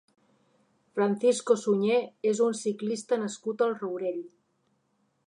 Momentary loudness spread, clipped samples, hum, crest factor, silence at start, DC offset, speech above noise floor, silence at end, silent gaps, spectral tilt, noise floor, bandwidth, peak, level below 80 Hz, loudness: 9 LU; under 0.1%; none; 18 dB; 0.95 s; under 0.1%; 46 dB; 1 s; none; -5 dB/octave; -73 dBFS; 11 kHz; -10 dBFS; -84 dBFS; -28 LUFS